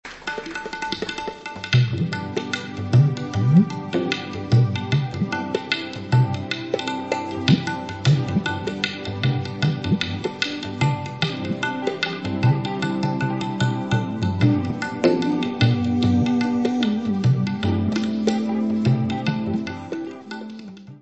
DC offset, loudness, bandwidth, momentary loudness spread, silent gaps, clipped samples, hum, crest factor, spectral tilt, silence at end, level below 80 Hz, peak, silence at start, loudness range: 0.1%; -22 LUFS; 8.2 kHz; 9 LU; none; under 0.1%; none; 20 dB; -6.5 dB/octave; 0.05 s; -52 dBFS; -2 dBFS; 0.05 s; 3 LU